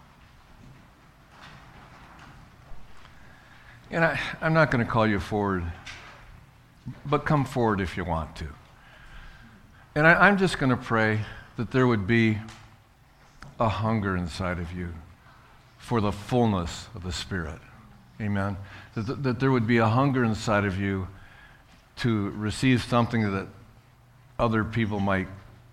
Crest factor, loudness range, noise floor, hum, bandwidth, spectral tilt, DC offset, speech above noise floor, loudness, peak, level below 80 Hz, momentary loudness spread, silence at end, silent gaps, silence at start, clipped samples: 24 dB; 7 LU; -56 dBFS; none; 13.5 kHz; -6.5 dB/octave; under 0.1%; 31 dB; -25 LUFS; -4 dBFS; -48 dBFS; 18 LU; 0.15 s; none; 0.65 s; under 0.1%